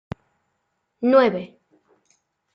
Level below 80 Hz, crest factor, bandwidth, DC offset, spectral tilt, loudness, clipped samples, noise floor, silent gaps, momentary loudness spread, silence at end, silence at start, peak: -60 dBFS; 20 dB; 6.2 kHz; under 0.1%; -7.5 dB/octave; -19 LUFS; under 0.1%; -74 dBFS; none; 23 LU; 1.1 s; 1 s; -4 dBFS